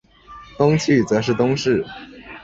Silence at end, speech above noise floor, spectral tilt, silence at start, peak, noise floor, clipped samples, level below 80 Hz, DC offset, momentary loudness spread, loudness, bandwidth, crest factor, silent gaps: 0 s; 24 dB; -6 dB/octave; 0.3 s; -2 dBFS; -42 dBFS; under 0.1%; -50 dBFS; under 0.1%; 17 LU; -18 LUFS; 8 kHz; 18 dB; none